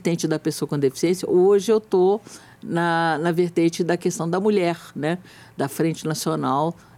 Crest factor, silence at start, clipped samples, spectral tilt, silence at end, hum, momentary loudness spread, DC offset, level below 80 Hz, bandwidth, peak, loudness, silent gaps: 12 dB; 0.05 s; under 0.1%; -5.5 dB/octave; 0.25 s; none; 9 LU; under 0.1%; -66 dBFS; 16 kHz; -8 dBFS; -22 LUFS; none